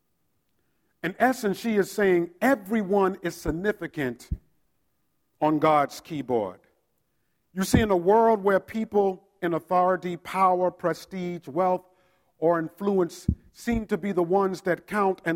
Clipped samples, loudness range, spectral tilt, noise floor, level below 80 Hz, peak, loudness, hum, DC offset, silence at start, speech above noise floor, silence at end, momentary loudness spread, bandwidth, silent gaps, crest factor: under 0.1%; 4 LU; -6 dB/octave; -75 dBFS; -48 dBFS; -6 dBFS; -25 LUFS; none; under 0.1%; 1.05 s; 50 dB; 0 s; 10 LU; 16.5 kHz; none; 20 dB